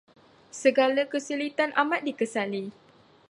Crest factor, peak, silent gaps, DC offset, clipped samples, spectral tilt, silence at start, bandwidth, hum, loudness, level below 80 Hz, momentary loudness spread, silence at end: 20 dB; -8 dBFS; none; under 0.1%; under 0.1%; -4 dB/octave; 0.55 s; 11.5 kHz; none; -26 LUFS; -80 dBFS; 11 LU; 0.6 s